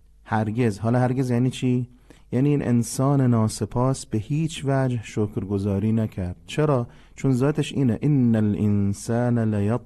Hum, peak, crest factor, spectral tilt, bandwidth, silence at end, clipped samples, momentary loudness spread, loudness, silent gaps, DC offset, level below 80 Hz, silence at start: none; -8 dBFS; 14 dB; -7 dB/octave; 12.5 kHz; 0 s; under 0.1%; 7 LU; -23 LUFS; none; under 0.1%; -50 dBFS; 0.25 s